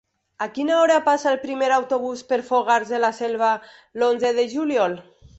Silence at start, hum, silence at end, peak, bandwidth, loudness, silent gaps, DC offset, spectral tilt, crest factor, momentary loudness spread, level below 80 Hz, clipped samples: 0.4 s; none; 0.1 s; -6 dBFS; 8.2 kHz; -21 LUFS; none; under 0.1%; -3.5 dB/octave; 16 dB; 9 LU; -64 dBFS; under 0.1%